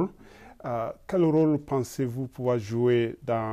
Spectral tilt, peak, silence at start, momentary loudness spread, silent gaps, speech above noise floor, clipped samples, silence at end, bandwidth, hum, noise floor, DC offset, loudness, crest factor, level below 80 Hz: -7.5 dB/octave; -14 dBFS; 0 s; 10 LU; none; 24 dB; under 0.1%; 0 s; 14.5 kHz; none; -50 dBFS; under 0.1%; -27 LUFS; 12 dB; -58 dBFS